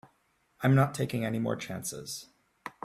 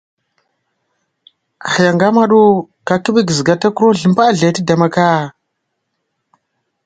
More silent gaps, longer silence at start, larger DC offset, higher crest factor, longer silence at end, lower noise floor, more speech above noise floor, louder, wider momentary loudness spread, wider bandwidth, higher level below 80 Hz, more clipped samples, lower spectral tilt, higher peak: neither; second, 0.6 s vs 1.65 s; neither; first, 20 dB vs 14 dB; second, 0.15 s vs 1.55 s; about the same, -71 dBFS vs -71 dBFS; second, 42 dB vs 60 dB; second, -30 LUFS vs -12 LUFS; first, 16 LU vs 8 LU; first, 15 kHz vs 9.4 kHz; second, -64 dBFS vs -56 dBFS; neither; about the same, -6 dB/octave vs -5.5 dB/octave; second, -12 dBFS vs 0 dBFS